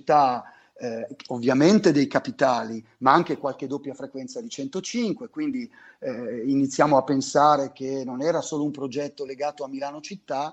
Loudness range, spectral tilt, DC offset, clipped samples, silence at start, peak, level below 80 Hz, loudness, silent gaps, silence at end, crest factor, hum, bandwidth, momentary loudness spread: 5 LU; -5.5 dB/octave; under 0.1%; under 0.1%; 0.05 s; -4 dBFS; -68 dBFS; -24 LUFS; none; 0 s; 22 dB; none; 8.6 kHz; 16 LU